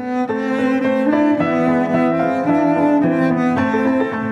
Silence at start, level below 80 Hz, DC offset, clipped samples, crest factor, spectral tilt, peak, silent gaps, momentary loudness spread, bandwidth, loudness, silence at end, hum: 0 s; -60 dBFS; under 0.1%; under 0.1%; 12 dB; -8 dB/octave; -4 dBFS; none; 4 LU; 8 kHz; -17 LUFS; 0 s; none